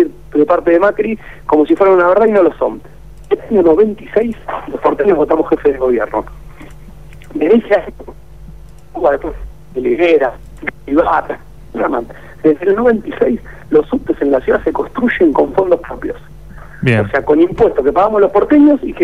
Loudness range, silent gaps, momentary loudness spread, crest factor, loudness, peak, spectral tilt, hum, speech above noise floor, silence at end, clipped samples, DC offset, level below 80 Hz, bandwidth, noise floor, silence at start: 5 LU; none; 15 LU; 12 dB; -13 LUFS; -2 dBFS; -8.5 dB/octave; none; 23 dB; 0 s; under 0.1%; 1%; -36 dBFS; 9.8 kHz; -35 dBFS; 0 s